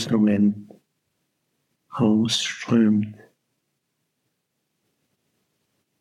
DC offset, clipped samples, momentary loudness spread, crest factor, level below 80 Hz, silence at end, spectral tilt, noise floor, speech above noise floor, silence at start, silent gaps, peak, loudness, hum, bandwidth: under 0.1%; under 0.1%; 15 LU; 18 dB; -74 dBFS; 2.85 s; -5.5 dB/octave; -76 dBFS; 56 dB; 0 s; none; -8 dBFS; -21 LUFS; none; 11.5 kHz